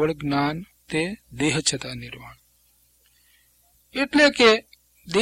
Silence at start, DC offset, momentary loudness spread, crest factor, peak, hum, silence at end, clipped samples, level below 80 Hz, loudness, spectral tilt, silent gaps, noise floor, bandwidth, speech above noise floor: 0 s; under 0.1%; 19 LU; 24 dB; 0 dBFS; 60 Hz at -55 dBFS; 0 s; under 0.1%; -54 dBFS; -21 LUFS; -3.5 dB/octave; none; -62 dBFS; 16 kHz; 39 dB